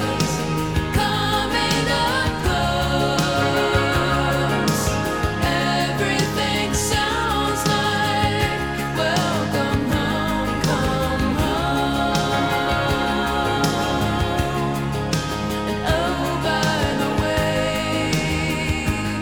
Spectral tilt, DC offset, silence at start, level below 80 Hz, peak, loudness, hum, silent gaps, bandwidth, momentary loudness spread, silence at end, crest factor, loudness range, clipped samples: -4.5 dB/octave; 0.5%; 0 s; -34 dBFS; -4 dBFS; -20 LUFS; none; none; over 20 kHz; 3 LU; 0 s; 16 dB; 2 LU; under 0.1%